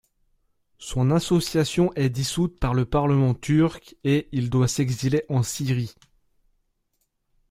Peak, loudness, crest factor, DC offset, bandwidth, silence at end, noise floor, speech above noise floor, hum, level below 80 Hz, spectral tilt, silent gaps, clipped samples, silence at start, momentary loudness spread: -8 dBFS; -23 LUFS; 16 dB; under 0.1%; 16 kHz; 1.6 s; -73 dBFS; 51 dB; none; -44 dBFS; -6 dB/octave; none; under 0.1%; 0.8 s; 5 LU